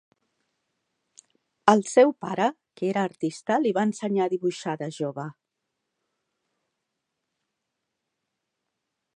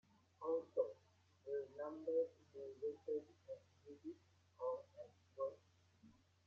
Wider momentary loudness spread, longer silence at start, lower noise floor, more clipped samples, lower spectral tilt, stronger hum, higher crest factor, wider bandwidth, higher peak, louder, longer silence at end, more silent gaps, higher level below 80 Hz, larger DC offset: second, 12 LU vs 18 LU; first, 1.65 s vs 0.4 s; first, -82 dBFS vs -74 dBFS; neither; about the same, -5.5 dB/octave vs -6.5 dB/octave; neither; about the same, 26 dB vs 22 dB; first, 11 kHz vs 7.2 kHz; first, -2 dBFS vs -26 dBFS; first, -25 LUFS vs -47 LUFS; first, 3.85 s vs 0.4 s; neither; first, -82 dBFS vs under -90 dBFS; neither